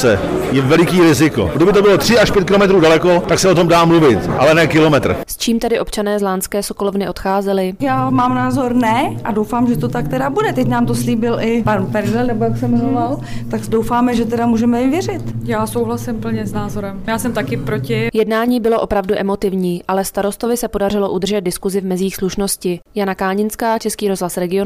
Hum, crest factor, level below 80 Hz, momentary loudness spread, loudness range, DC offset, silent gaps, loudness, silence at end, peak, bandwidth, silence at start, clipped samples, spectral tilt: none; 10 dB; -36 dBFS; 9 LU; 7 LU; under 0.1%; none; -15 LUFS; 0 s; -6 dBFS; 16 kHz; 0 s; under 0.1%; -5.5 dB/octave